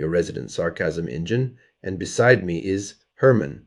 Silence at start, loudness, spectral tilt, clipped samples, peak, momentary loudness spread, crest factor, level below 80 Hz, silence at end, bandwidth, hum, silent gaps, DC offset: 0 s; -22 LUFS; -6 dB/octave; under 0.1%; 0 dBFS; 13 LU; 22 dB; -50 dBFS; 0.05 s; 11.5 kHz; none; none; under 0.1%